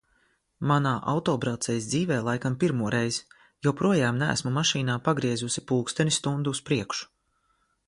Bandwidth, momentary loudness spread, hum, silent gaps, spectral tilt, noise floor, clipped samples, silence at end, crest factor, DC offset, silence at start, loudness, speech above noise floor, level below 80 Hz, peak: 11.5 kHz; 5 LU; none; none; -4.5 dB/octave; -71 dBFS; under 0.1%; 0.8 s; 20 dB; under 0.1%; 0.6 s; -26 LUFS; 45 dB; -60 dBFS; -8 dBFS